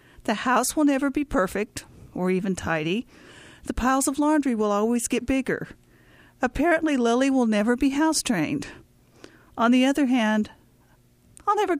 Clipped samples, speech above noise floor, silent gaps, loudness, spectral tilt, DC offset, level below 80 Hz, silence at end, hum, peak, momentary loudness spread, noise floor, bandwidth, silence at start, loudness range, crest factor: under 0.1%; 35 dB; none; -24 LUFS; -4.5 dB/octave; under 0.1%; -48 dBFS; 0 s; none; -8 dBFS; 11 LU; -58 dBFS; 15.5 kHz; 0.2 s; 3 LU; 16 dB